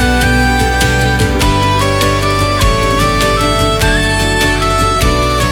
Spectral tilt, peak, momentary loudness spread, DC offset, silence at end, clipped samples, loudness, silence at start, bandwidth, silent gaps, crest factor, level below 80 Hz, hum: -4.5 dB/octave; 0 dBFS; 1 LU; under 0.1%; 0 s; under 0.1%; -11 LUFS; 0 s; 19.5 kHz; none; 10 dB; -18 dBFS; none